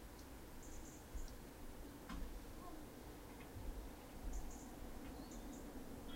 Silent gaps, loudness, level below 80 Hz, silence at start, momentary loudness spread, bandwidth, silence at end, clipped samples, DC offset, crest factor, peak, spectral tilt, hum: none; -55 LUFS; -54 dBFS; 0 s; 4 LU; 16 kHz; 0 s; under 0.1%; under 0.1%; 16 dB; -36 dBFS; -5 dB/octave; none